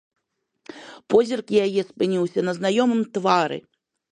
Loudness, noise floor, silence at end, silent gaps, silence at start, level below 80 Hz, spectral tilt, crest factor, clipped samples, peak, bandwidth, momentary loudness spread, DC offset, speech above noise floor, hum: -22 LUFS; -75 dBFS; 0.55 s; none; 0.75 s; -68 dBFS; -5.5 dB/octave; 20 dB; under 0.1%; -4 dBFS; 10.5 kHz; 15 LU; under 0.1%; 54 dB; none